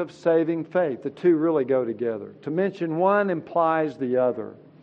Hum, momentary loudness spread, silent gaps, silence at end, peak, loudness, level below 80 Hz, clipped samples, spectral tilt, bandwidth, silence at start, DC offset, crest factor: none; 8 LU; none; 0.3 s; -8 dBFS; -24 LUFS; -76 dBFS; under 0.1%; -8.5 dB/octave; 7.4 kHz; 0 s; under 0.1%; 16 dB